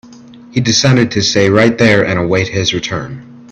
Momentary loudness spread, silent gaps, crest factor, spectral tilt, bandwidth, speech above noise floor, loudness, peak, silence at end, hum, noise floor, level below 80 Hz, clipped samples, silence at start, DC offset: 11 LU; none; 12 dB; -4.5 dB/octave; 8.6 kHz; 25 dB; -12 LUFS; 0 dBFS; 0.1 s; none; -36 dBFS; -44 dBFS; under 0.1%; 0.1 s; under 0.1%